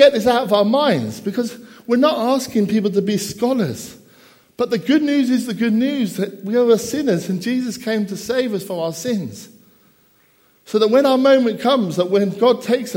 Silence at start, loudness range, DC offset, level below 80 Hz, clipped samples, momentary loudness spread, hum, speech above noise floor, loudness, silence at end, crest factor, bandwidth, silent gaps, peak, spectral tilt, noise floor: 0 s; 5 LU; under 0.1%; -60 dBFS; under 0.1%; 10 LU; none; 39 dB; -18 LUFS; 0 s; 18 dB; 16.5 kHz; none; 0 dBFS; -5.5 dB/octave; -56 dBFS